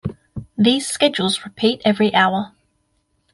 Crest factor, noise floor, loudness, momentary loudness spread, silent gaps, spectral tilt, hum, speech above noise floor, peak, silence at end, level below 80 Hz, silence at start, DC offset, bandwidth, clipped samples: 18 dB; -67 dBFS; -18 LUFS; 16 LU; none; -4 dB/octave; none; 49 dB; -2 dBFS; 0.85 s; -50 dBFS; 0.05 s; under 0.1%; 11.5 kHz; under 0.1%